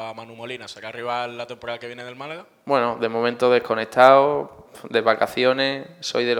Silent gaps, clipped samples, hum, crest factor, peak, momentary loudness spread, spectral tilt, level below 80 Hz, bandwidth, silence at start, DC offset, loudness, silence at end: none; under 0.1%; none; 22 dB; 0 dBFS; 20 LU; -4.5 dB/octave; -68 dBFS; 17.5 kHz; 0 s; under 0.1%; -20 LUFS; 0 s